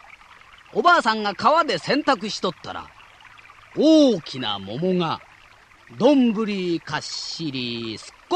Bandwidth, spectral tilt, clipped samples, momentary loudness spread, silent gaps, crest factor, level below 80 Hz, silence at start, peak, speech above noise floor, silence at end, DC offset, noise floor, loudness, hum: 9.8 kHz; -5 dB/octave; under 0.1%; 15 LU; none; 16 dB; -60 dBFS; 0.75 s; -6 dBFS; 30 dB; 0 s; under 0.1%; -51 dBFS; -21 LUFS; none